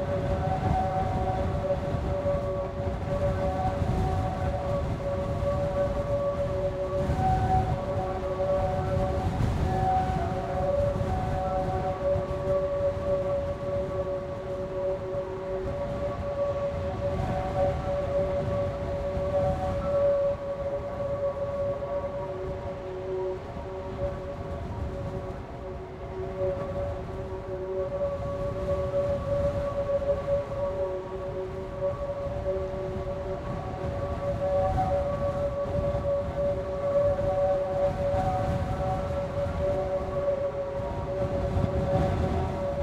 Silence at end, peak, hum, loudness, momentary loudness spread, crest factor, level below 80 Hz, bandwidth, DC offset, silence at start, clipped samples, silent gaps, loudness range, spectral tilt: 0 s; -12 dBFS; none; -29 LUFS; 8 LU; 16 dB; -40 dBFS; 10.5 kHz; under 0.1%; 0 s; under 0.1%; none; 5 LU; -8 dB/octave